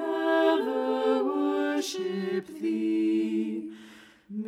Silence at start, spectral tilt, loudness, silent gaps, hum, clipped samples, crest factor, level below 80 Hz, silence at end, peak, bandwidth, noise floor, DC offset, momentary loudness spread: 0 s; -5 dB/octave; -27 LUFS; none; none; under 0.1%; 16 dB; -78 dBFS; 0 s; -12 dBFS; 14.5 kHz; -51 dBFS; under 0.1%; 10 LU